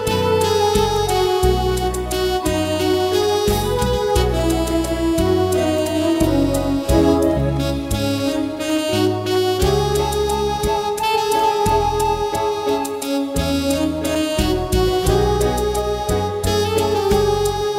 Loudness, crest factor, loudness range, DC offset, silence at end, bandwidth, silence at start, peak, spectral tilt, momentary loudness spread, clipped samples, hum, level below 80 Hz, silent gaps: -18 LUFS; 16 dB; 1 LU; under 0.1%; 0 s; 16 kHz; 0 s; -2 dBFS; -5 dB/octave; 4 LU; under 0.1%; none; -28 dBFS; none